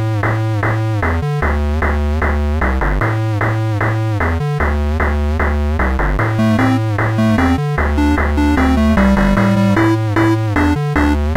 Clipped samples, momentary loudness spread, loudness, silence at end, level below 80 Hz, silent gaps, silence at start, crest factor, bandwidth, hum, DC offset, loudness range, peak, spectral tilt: under 0.1%; 4 LU; -15 LUFS; 0 s; -20 dBFS; none; 0 s; 12 dB; 14.5 kHz; none; under 0.1%; 3 LU; -2 dBFS; -7.5 dB/octave